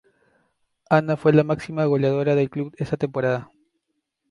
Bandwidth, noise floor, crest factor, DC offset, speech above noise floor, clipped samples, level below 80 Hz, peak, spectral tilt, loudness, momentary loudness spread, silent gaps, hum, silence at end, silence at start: 11 kHz; -76 dBFS; 20 dB; under 0.1%; 56 dB; under 0.1%; -58 dBFS; -4 dBFS; -8.5 dB/octave; -22 LUFS; 9 LU; none; none; 0.85 s; 0.9 s